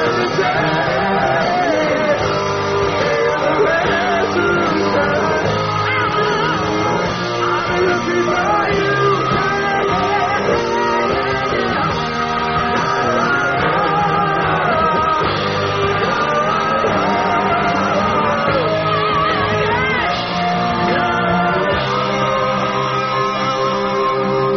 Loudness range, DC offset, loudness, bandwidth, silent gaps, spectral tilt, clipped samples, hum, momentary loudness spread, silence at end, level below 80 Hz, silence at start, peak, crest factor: 1 LU; 0.2%; -16 LUFS; 6.6 kHz; none; -3.5 dB/octave; under 0.1%; none; 2 LU; 0 s; -40 dBFS; 0 s; -4 dBFS; 12 dB